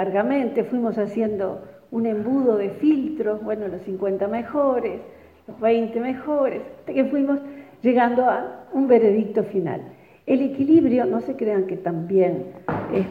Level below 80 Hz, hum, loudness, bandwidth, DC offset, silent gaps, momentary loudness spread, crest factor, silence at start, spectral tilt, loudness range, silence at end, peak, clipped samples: -60 dBFS; none; -22 LUFS; 4.8 kHz; under 0.1%; none; 11 LU; 16 dB; 0 s; -9.5 dB/octave; 4 LU; 0 s; -6 dBFS; under 0.1%